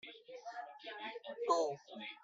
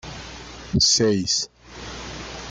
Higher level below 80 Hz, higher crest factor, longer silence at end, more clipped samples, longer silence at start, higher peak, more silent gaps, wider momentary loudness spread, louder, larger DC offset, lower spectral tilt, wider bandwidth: second, under -90 dBFS vs -44 dBFS; about the same, 22 dB vs 18 dB; about the same, 0.05 s vs 0 s; neither; about the same, 0.05 s vs 0.05 s; second, -20 dBFS vs -8 dBFS; neither; second, 15 LU vs 21 LU; second, -41 LUFS vs -19 LUFS; neither; about the same, -3 dB/octave vs -3 dB/octave; second, 8.2 kHz vs 12 kHz